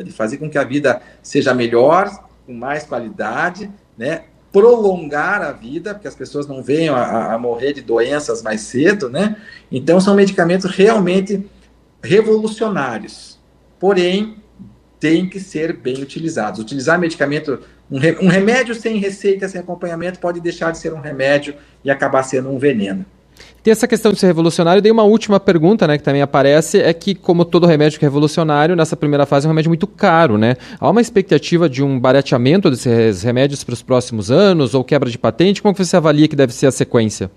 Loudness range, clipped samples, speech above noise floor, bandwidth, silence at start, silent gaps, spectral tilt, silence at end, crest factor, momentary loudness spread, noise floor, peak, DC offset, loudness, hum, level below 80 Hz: 6 LU; under 0.1%; 35 dB; 13.5 kHz; 0 s; none; -6 dB/octave; 0.05 s; 14 dB; 12 LU; -49 dBFS; 0 dBFS; under 0.1%; -15 LUFS; none; -52 dBFS